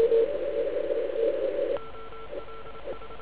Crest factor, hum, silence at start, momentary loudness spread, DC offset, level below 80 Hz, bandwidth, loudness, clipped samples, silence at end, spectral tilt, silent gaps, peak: 16 dB; none; 0 s; 16 LU; 1%; -54 dBFS; 4 kHz; -29 LUFS; under 0.1%; 0 s; -9 dB/octave; none; -12 dBFS